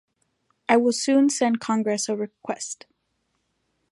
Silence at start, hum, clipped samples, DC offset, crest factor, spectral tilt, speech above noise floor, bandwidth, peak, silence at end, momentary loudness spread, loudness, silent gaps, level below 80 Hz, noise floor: 0.7 s; none; under 0.1%; under 0.1%; 20 dB; -3.5 dB/octave; 51 dB; 11.5 kHz; -6 dBFS; 1.15 s; 13 LU; -23 LUFS; none; -76 dBFS; -74 dBFS